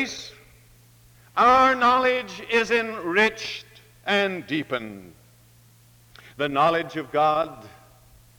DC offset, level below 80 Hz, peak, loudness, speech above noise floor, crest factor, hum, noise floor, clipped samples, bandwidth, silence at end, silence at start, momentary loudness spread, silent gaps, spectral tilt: under 0.1%; -58 dBFS; -6 dBFS; -22 LUFS; 32 dB; 20 dB; none; -54 dBFS; under 0.1%; over 20 kHz; 0.7 s; 0 s; 16 LU; none; -4 dB/octave